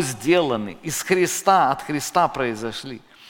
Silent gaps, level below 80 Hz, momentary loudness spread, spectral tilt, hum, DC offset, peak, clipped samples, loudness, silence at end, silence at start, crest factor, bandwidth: none; -54 dBFS; 12 LU; -4 dB/octave; none; under 0.1%; -2 dBFS; under 0.1%; -21 LUFS; 0.05 s; 0 s; 20 dB; 17 kHz